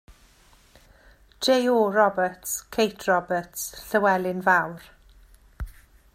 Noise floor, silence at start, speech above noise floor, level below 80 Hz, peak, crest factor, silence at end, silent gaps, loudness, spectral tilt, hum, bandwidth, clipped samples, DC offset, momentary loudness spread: -56 dBFS; 0.1 s; 33 dB; -48 dBFS; -6 dBFS; 20 dB; 0.45 s; none; -23 LUFS; -3.5 dB/octave; none; 16 kHz; under 0.1%; under 0.1%; 21 LU